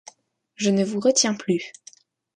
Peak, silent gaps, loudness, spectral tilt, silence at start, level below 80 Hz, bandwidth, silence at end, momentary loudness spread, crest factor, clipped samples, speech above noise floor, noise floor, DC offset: -6 dBFS; none; -22 LUFS; -3.5 dB/octave; 0.6 s; -70 dBFS; 11 kHz; 0.65 s; 8 LU; 20 dB; under 0.1%; 39 dB; -61 dBFS; under 0.1%